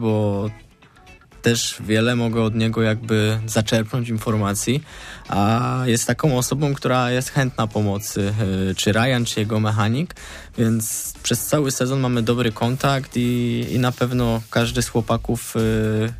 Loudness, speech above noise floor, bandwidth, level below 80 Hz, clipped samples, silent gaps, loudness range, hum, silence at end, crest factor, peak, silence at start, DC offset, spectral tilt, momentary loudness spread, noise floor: -21 LUFS; 27 dB; 15.5 kHz; -42 dBFS; under 0.1%; none; 1 LU; none; 0 s; 14 dB; -6 dBFS; 0 s; under 0.1%; -5 dB/octave; 4 LU; -47 dBFS